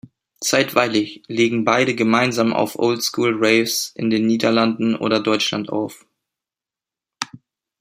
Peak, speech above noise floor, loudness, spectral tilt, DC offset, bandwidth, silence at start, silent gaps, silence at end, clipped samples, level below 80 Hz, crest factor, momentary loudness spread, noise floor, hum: 0 dBFS; 71 dB; -18 LUFS; -4 dB/octave; under 0.1%; 16 kHz; 0.4 s; none; 0.45 s; under 0.1%; -64 dBFS; 20 dB; 9 LU; -89 dBFS; none